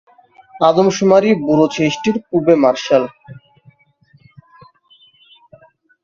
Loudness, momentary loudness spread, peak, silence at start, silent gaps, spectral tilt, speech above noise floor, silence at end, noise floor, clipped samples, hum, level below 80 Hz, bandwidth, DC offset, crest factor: -14 LUFS; 5 LU; 0 dBFS; 0.55 s; none; -6 dB/octave; 40 dB; 2.65 s; -54 dBFS; under 0.1%; none; -56 dBFS; 7.4 kHz; under 0.1%; 16 dB